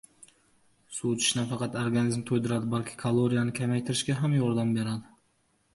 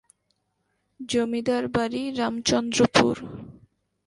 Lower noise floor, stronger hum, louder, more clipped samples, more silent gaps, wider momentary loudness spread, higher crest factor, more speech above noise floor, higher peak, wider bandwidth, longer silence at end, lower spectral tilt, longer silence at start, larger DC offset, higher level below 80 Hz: second, -70 dBFS vs -74 dBFS; neither; second, -28 LUFS vs -24 LUFS; neither; neither; second, 6 LU vs 17 LU; second, 16 dB vs 24 dB; second, 43 dB vs 50 dB; second, -14 dBFS vs -2 dBFS; about the same, 11.5 kHz vs 11.5 kHz; first, 0.7 s vs 0.55 s; about the same, -5 dB/octave vs -4 dB/octave; about the same, 0.9 s vs 1 s; neither; second, -62 dBFS vs -54 dBFS